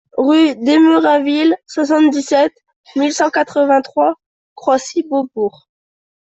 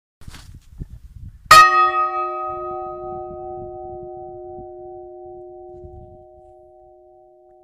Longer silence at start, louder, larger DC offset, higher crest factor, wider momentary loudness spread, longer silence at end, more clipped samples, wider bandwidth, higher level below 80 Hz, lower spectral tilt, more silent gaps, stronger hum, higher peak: about the same, 0.15 s vs 0.2 s; about the same, -14 LUFS vs -14 LUFS; neither; second, 12 dB vs 22 dB; second, 9 LU vs 29 LU; second, 0.9 s vs 1.6 s; neither; second, 8.2 kHz vs 15.5 kHz; second, -62 dBFS vs -46 dBFS; first, -3.5 dB/octave vs -2 dB/octave; first, 2.76-2.84 s, 4.26-4.56 s vs none; neither; about the same, -2 dBFS vs 0 dBFS